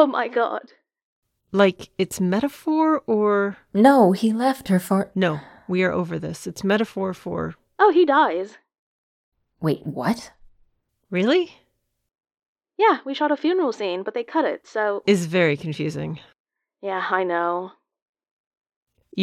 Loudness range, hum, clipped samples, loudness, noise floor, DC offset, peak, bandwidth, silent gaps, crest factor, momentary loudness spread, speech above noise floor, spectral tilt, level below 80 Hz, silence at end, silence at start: 7 LU; none; under 0.1%; -22 LUFS; -64 dBFS; under 0.1%; -2 dBFS; 16.5 kHz; 1.02-1.22 s, 8.79-9.32 s, 12.48-12.55 s, 16.40-16.44 s, 18.02-18.13 s, 18.31-18.51 s, 18.57-18.61 s, 18.76-18.87 s; 20 dB; 12 LU; 43 dB; -6 dB/octave; -62 dBFS; 0 s; 0 s